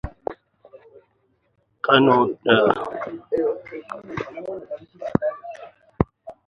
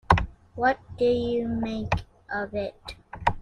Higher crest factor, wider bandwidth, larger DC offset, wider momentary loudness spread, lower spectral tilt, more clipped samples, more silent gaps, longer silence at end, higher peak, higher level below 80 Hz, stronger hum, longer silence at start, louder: about the same, 24 dB vs 26 dB; second, 6.8 kHz vs 10.5 kHz; neither; first, 18 LU vs 12 LU; about the same, -7.5 dB/octave vs -7 dB/octave; neither; neither; first, 0.15 s vs 0 s; about the same, 0 dBFS vs -2 dBFS; second, -46 dBFS vs -40 dBFS; neither; about the same, 0.05 s vs 0.1 s; first, -22 LUFS vs -27 LUFS